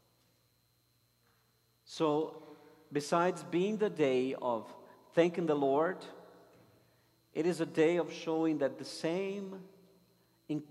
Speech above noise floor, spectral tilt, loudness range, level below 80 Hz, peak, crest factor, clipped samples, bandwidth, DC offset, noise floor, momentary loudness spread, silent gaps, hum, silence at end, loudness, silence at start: 41 dB; -6 dB/octave; 3 LU; -84 dBFS; -14 dBFS; 20 dB; under 0.1%; 13 kHz; under 0.1%; -73 dBFS; 13 LU; none; none; 0.05 s; -33 LUFS; 1.9 s